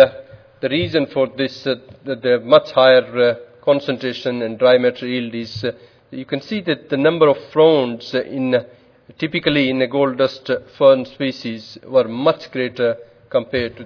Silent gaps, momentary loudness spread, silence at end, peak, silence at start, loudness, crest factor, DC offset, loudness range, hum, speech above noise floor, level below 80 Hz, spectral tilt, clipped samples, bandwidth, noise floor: none; 12 LU; 0 s; 0 dBFS; 0 s; -18 LUFS; 18 dB; under 0.1%; 3 LU; none; 22 dB; -58 dBFS; -6.5 dB/octave; under 0.1%; 5.4 kHz; -39 dBFS